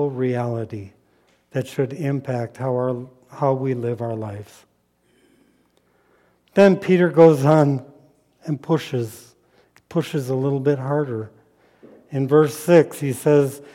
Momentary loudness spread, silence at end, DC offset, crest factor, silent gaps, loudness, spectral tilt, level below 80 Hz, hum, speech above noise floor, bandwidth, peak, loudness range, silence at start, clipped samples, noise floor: 16 LU; 0.1 s; under 0.1%; 18 dB; none; -20 LUFS; -7.5 dB/octave; -66 dBFS; 60 Hz at -50 dBFS; 44 dB; 16.5 kHz; -2 dBFS; 9 LU; 0 s; under 0.1%; -63 dBFS